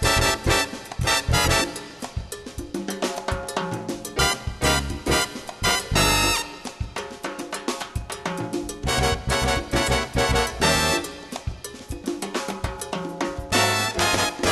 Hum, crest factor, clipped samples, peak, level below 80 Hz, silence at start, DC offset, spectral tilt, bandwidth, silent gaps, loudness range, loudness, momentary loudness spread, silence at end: none; 18 dB; under 0.1%; -6 dBFS; -34 dBFS; 0 s; under 0.1%; -3 dB/octave; 13 kHz; none; 4 LU; -23 LUFS; 14 LU; 0 s